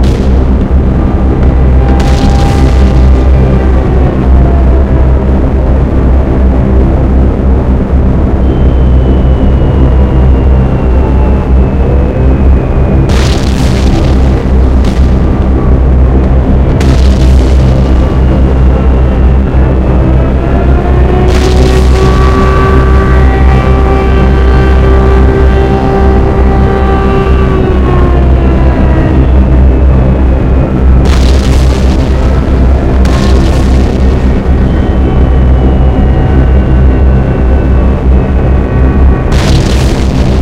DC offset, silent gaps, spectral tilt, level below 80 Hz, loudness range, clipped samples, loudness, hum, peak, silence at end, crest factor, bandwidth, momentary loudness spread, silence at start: under 0.1%; none; -8 dB/octave; -6 dBFS; 2 LU; 6%; -8 LUFS; none; 0 dBFS; 0 s; 6 dB; 8.2 kHz; 2 LU; 0 s